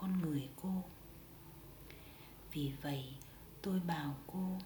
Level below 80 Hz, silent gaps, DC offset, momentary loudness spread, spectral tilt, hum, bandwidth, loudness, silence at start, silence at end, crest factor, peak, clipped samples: -62 dBFS; none; under 0.1%; 17 LU; -6.5 dB/octave; none; over 20 kHz; -42 LUFS; 0 s; 0 s; 16 dB; -26 dBFS; under 0.1%